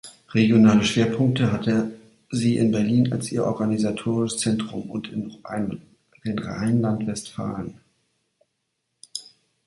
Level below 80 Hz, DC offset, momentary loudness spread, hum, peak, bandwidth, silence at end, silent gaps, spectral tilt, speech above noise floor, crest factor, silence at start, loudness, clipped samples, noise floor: -56 dBFS; under 0.1%; 14 LU; none; -4 dBFS; 11.5 kHz; 0.45 s; none; -6 dB/octave; 55 dB; 20 dB; 0.05 s; -23 LUFS; under 0.1%; -77 dBFS